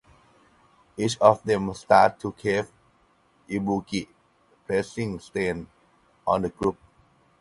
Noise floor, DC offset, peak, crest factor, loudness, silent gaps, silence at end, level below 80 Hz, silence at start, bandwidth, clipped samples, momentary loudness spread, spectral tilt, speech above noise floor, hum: -63 dBFS; under 0.1%; -2 dBFS; 24 dB; -25 LUFS; none; 0.65 s; -56 dBFS; 0.95 s; 11.5 kHz; under 0.1%; 14 LU; -5.5 dB/octave; 39 dB; none